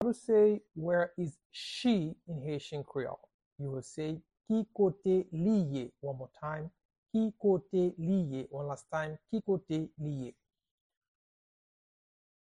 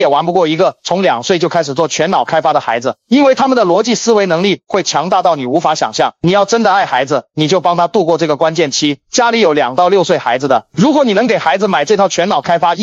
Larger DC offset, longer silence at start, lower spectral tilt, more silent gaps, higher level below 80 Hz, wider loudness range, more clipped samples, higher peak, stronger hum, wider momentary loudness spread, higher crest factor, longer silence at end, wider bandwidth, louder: neither; about the same, 0 s vs 0 s; first, -7.5 dB/octave vs -4.5 dB/octave; first, 1.45-1.50 s, 3.34-3.39 s, 3.46-3.56 s, 6.85-6.89 s, 6.98-7.03 s vs none; second, -68 dBFS vs -56 dBFS; first, 6 LU vs 1 LU; neither; second, -18 dBFS vs 0 dBFS; neither; first, 13 LU vs 4 LU; about the same, 16 dB vs 12 dB; first, 2.15 s vs 0 s; first, 11 kHz vs 8 kHz; second, -34 LUFS vs -12 LUFS